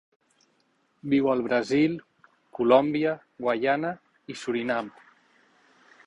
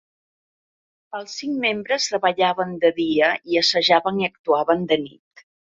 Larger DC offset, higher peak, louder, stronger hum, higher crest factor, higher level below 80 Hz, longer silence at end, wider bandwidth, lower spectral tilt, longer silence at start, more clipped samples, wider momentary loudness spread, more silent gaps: neither; second, -6 dBFS vs -2 dBFS; second, -25 LUFS vs -20 LUFS; neither; about the same, 22 dB vs 20 dB; about the same, -68 dBFS vs -64 dBFS; first, 1.15 s vs 0.7 s; first, 11 kHz vs 7.8 kHz; first, -6.5 dB/octave vs -3.5 dB/octave; about the same, 1.05 s vs 1.15 s; neither; first, 20 LU vs 12 LU; second, none vs 4.39-4.44 s